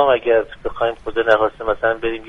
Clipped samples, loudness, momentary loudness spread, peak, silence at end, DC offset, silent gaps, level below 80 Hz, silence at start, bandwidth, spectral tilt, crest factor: under 0.1%; -18 LUFS; 7 LU; 0 dBFS; 0 s; under 0.1%; none; -42 dBFS; 0 s; 6.6 kHz; -6 dB/octave; 18 dB